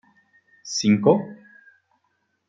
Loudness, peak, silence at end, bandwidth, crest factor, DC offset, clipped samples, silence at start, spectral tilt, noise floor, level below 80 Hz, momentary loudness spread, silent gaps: -20 LUFS; -4 dBFS; 1.15 s; 7.8 kHz; 20 dB; under 0.1%; under 0.1%; 0.65 s; -5.5 dB/octave; -72 dBFS; -70 dBFS; 21 LU; none